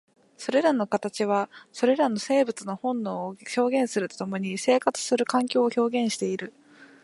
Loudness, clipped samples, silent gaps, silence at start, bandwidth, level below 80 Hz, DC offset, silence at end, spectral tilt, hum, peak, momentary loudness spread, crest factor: -26 LUFS; under 0.1%; none; 0.4 s; 11.5 kHz; -78 dBFS; under 0.1%; 0.2 s; -4.5 dB/octave; none; -6 dBFS; 8 LU; 20 dB